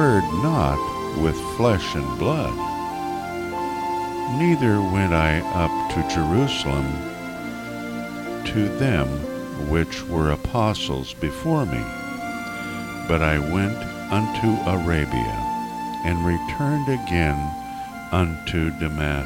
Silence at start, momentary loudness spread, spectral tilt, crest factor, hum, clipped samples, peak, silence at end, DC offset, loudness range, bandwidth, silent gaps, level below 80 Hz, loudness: 0 s; 10 LU; -6.5 dB/octave; 18 dB; 60 Hz at -50 dBFS; under 0.1%; -6 dBFS; 0 s; under 0.1%; 3 LU; 17 kHz; none; -36 dBFS; -23 LUFS